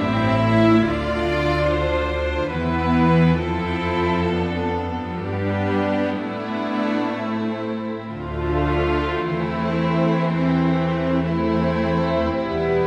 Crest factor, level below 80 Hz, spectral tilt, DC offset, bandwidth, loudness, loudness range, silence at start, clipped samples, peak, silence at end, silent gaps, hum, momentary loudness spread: 14 dB; -34 dBFS; -8 dB/octave; under 0.1%; 8.4 kHz; -21 LUFS; 4 LU; 0 s; under 0.1%; -6 dBFS; 0 s; none; none; 8 LU